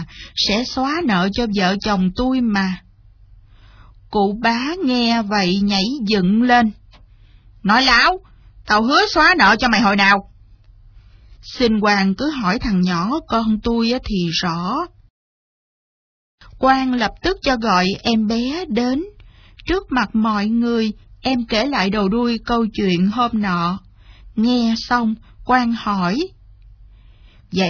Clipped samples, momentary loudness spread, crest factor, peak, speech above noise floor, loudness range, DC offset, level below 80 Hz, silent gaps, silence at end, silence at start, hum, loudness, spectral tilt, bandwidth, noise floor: under 0.1%; 10 LU; 18 dB; 0 dBFS; 30 dB; 6 LU; under 0.1%; -40 dBFS; 15.10-16.38 s; 0 s; 0 s; none; -17 LUFS; -5 dB/octave; 5.4 kHz; -47 dBFS